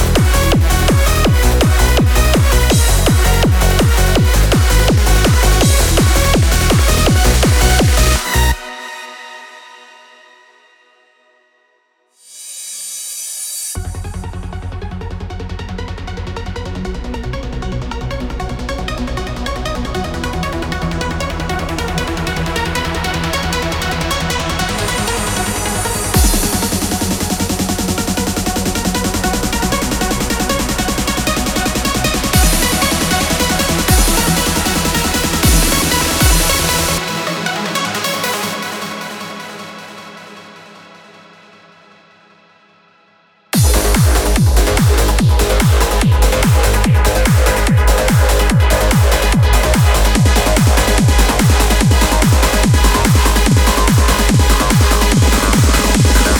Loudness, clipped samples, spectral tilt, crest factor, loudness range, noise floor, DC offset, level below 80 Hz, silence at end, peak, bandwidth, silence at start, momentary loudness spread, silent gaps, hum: -14 LUFS; under 0.1%; -4 dB/octave; 14 dB; 13 LU; -59 dBFS; under 0.1%; -18 dBFS; 0 s; 0 dBFS; 18.5 kHz; 0 s; 13 LU; none; none